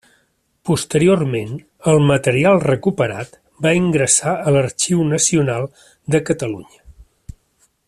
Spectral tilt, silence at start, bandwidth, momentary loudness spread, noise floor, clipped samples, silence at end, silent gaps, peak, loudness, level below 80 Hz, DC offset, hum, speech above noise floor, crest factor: -5 dB/octave; 0.65 s; 13.5 kHz; 15 LU; -63 dBFS; under 0.1%; 0.85 s; none; -2 dBFS; -16 LUFS; -48 dBFS; under 0.1%; none; 46 dB; 16 dB